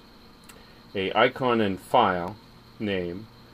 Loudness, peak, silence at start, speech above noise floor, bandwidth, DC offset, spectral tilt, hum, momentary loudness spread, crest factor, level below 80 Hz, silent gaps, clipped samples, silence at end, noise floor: -25 LUFS; -6 dBFS; 0.95 s; 25 dB; 15.5 kHz; under 0.1%; -6 dB/octave; none; 15 LU; 20 dB; -58 dBFS; none; under 0.1%; 0.3 s; -50 dBFS